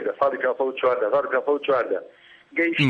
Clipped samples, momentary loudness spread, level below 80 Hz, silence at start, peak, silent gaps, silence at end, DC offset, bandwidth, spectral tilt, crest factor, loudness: under 0.1%; 5 LU; -68 dBFS; 0 s; -6 dBFS; none; 0 s; under 0.1%; 8.6 kHz; -7 dB/octave; 16 dB; -23 LUFS